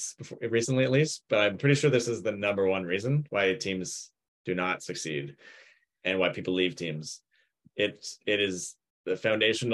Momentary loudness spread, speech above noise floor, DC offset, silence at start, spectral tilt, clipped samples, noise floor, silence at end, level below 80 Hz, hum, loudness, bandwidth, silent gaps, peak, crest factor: 14 LU; 37 dB; under 0.1%; 0 s; -4.5 dB/octave; under 0.1%; -66 dBFS; 0 s; -70 dBFS; none; -28 LUFS; 12.5 kHz; 4.28-4.44 s, 8.90-9.04 s; -8 dBFS; 20 dB